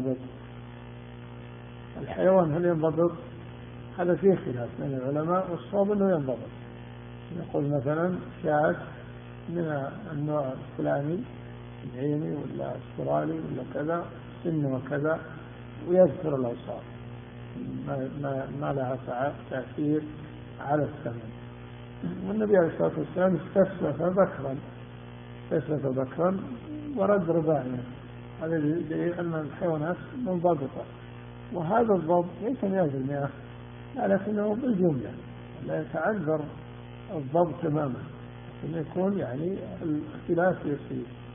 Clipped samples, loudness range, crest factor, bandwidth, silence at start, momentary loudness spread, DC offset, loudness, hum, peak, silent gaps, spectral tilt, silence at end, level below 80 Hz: under 0.1%; 5 LU; 20 dB; 3.7 kHz; 0 s; 19 LU; under 0.1%; -29 LUFS; 60 Hz at -45 dBFS; -8 dBFS; none; -5.5 dB/octave; 0 s; -56 dBFS